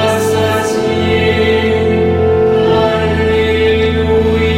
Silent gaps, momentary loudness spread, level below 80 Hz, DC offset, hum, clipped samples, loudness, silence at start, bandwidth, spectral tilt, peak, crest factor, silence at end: none; 2 LU; -28 dBFS; under 0.1%; none; under 0.1%; -12 LUFS; 0 s; 16 kHz; -6 dB/octave; -2 dBFS; 10 dB; 0 s